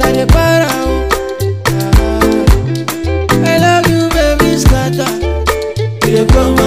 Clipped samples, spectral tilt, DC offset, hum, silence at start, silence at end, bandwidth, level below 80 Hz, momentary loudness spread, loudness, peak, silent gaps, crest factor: under 0.1%; -5.5 dB/octave; 0.6%; none; 0 s; 0 s; 16 kHz; -16 dBFS; 7 LU; -12 LUFS; 0 dBFS; none; 10 dB